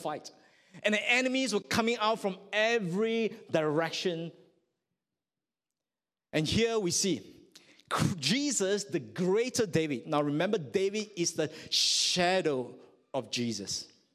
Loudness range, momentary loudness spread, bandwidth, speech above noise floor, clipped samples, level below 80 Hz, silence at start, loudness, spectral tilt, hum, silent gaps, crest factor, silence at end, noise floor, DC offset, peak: 5 LU; 10 LU; 15.5 kHz; over 60 dB; under 0.1%; -62 dBFS; 0 s; -30 LUFS; -3.5 dB/octave; none; none; 20 dB; 0.3 s; under -90 dBFS; under 0.1%; -12 dBFS